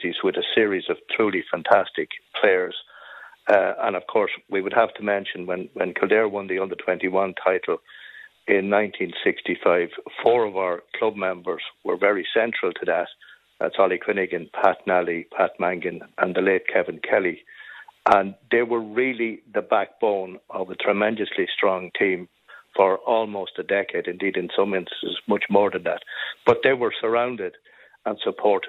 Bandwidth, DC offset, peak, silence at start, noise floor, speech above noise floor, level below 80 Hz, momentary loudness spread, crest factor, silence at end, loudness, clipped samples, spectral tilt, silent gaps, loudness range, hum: 6.4 kHz; under 0.1%; -2 dBFS; 0 s; -44 dBFS; 21 dB; -68 dBFS; 10 LU; 20 dB; 0 s; -23 LUFS; under 0.1%; -6.5 dB/octave; none; 1 LU; none